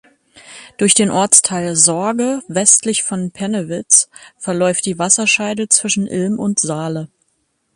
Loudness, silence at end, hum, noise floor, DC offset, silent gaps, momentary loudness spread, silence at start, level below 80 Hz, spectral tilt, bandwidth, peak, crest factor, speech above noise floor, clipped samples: -14 LUFS; 0.7 s; none; -66 dBFS; under 0.1%; none; 12 LU; 0.35 s; -58 dBFS; -2.5 dB/octave; 16 kHz; 0 dBFS; 16 dB; 50 dB; under 0.1%